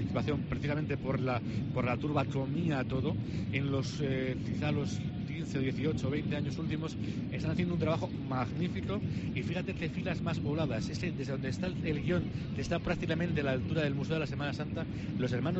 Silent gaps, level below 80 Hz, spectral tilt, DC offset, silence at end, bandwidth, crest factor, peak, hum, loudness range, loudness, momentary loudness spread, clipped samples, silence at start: none; -52 dBFS; -7 dB/octave; under 0.1%; 0 s; 8.2 kHz; 16 dB; -18 dBFS; none; 1 LU; -34 LUFS; 4 LU; under 0.1%; 0 s